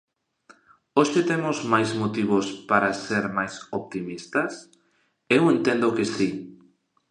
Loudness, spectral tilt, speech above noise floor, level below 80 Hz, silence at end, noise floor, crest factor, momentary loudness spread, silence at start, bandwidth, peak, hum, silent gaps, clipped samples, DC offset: -24 LUFS; -5.5 dB/octave; 44 dB; -66 dBFS; 0.55 s; -68 dBFS; 20 dB; 12 LU; 0.95 s; 10.5 kHz; -4 dBFS; none; none; under 0.1%; under 0.1%